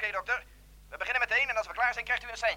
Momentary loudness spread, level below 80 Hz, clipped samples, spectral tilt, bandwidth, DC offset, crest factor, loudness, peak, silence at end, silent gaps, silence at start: 8 LU; -56 dBFS; under 0.1%; -1 dB/octave; 17 kHz; under 0.1%; 16 dB; -29 LUFS; -16 dBFS; 0 s; none; 0 s